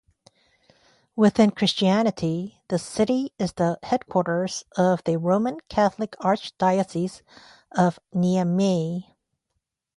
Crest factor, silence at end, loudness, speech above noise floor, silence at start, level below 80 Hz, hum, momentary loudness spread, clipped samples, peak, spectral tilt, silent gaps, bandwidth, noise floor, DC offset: 18 dB; 0.95 s; -23 LUFS; 56 dB; 1.15 s; -58 dBFS; none; 9 LU; under 0.1%; -6 dBFS; -6 dB/octave; none; 11.5 kHz; -79 dBFS; under 0.1%